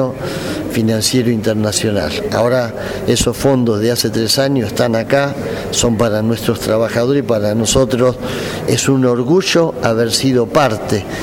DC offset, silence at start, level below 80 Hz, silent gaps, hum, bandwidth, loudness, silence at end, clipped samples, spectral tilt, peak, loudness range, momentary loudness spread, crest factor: under 0.1%; 0 s; -38 dBFS; none; none; 18.5 kHz; -15 LUFS; 0 s; under 0.1%; -4.5 dB/octave; 0 dBFS; 1 LU; 6 LU; 14 dB